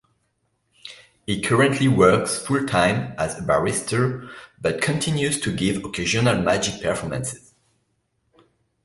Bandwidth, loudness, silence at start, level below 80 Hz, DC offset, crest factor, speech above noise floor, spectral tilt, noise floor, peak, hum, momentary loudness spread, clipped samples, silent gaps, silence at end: 12 kHz; -21 LUFS; 0.85 s; -48 dBFS; under 0.1%; 20 dB; 49 dB; -4.5 dB/octave; -71 dBFS; -2 dBFS; none; 18 LU; under 0.1%; none; 1.45 s